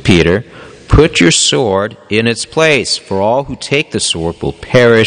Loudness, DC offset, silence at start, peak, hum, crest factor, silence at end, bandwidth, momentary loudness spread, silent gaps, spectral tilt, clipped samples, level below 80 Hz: -12 LUFS; under 0.1%; 0 s; 0 dBFS; none; 12 dB; 0 s; 10 kHz; 8 LU; none; -4 dB/octave; 0.5%; -26 dBFS